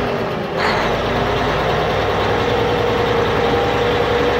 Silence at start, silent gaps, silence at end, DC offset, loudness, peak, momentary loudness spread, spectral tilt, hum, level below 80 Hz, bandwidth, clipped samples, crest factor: 0 s; none; 0 s; under 0.1%; -17 LUFS; -4 dBFS; 2 LU; -5.5 dB/octave; none; -32 dBFS; 16 kHz; under 0.1%; 12 dB